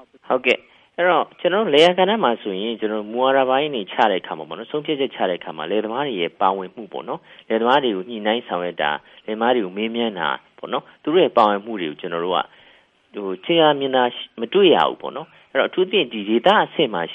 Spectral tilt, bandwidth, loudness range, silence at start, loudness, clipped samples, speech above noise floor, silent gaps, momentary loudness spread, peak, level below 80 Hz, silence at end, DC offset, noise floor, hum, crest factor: -5.5 dB/octave; 9.4 kHz; 4 LU; 0.3 s; -20 LUFS; under 0.1%; 34 dB; none; 14 LU; -2 dBFS; -70 dBFS; 0 s; under 0.1%; -54 dBFS; none; 18 dB